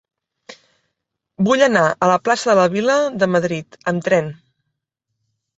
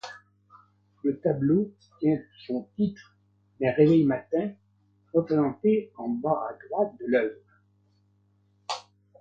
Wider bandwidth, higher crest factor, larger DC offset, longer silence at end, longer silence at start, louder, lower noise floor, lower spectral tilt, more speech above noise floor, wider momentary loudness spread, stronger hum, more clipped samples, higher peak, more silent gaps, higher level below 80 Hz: about the same, 8.2 kHz vs 8 kHz; about the same, 18 dB vs 20 dB; neither; first, 1.25 s vs 0.4 s; first, 0.5 s vs 0.05 s; first, -17 LUFS vs -27 LUFS; first, -78 dBFS vs -66 dBFS; second, -5 dB/octave vs -8 dB/octave; first, 61 dB vs 41 dB; second, 9 LU vs 13 LU; second, none vs 50 Hz at -50 dBFS; neither; first, -2 dBFS vs -8 dBFS; neither; about the same, -62 dBFS vs -66 dBFS